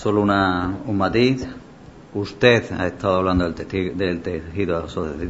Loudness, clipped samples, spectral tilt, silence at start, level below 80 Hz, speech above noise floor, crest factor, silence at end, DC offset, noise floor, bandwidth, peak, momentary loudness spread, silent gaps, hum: -21 LUFS; under 0.1%; -6.5 dB/octave; 0 s; -42 dBFS; 22 dB; 20 dB; 0 s; 0.1%; -43 dBFS; 8 kHz; 0 dBFS; 12 LU; none; none